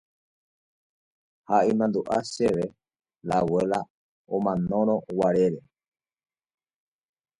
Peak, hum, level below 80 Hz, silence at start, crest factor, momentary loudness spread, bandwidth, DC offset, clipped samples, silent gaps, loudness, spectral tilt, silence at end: -8 dBFS; none; -60 dBFS; 1.5 s; 20 dB; 10 LU; 11.5 kHz; under 0.1%; under 0.1%; 3.90-4.25 s; -25 LUFS; -7 dB/octave; 1.8 s